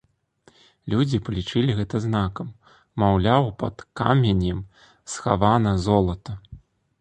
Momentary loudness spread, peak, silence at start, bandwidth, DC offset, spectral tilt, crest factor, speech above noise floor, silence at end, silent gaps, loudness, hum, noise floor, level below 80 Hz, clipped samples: 17 LU; -2 dBFS; 0.85 s; 9.4 kHz; under 0.1%; -7 dB/octave; 20 dB; 37 dB; 0.45 s; none; -22 LUFS; none; -59 dBFS; -40 dBFS; under 0.1%